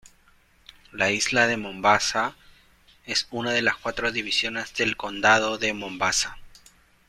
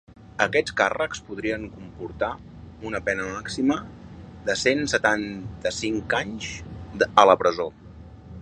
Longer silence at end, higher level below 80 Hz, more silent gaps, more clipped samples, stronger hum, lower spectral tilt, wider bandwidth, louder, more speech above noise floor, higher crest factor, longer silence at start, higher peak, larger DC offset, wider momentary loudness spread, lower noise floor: first, 0.6 s vs 0 s; second, -54 dBFS vs -48 dBFS; neither; neither; neither; second, -2 dB/octave vs -4 dB/octave; first, 16 kHz vs 10.5 kHz; about the same, -23 LUFS vs -24 LUFS; first, 35 dB vs 19 dB; about the same, 22 dB vs 24 dB; first, 0.95 s vs 0.1 s; second, -4 dBFS vs 0 dBFS; neither; second, 7 LU vs 18 LU; first, -59 dBFS vs -43 dBFS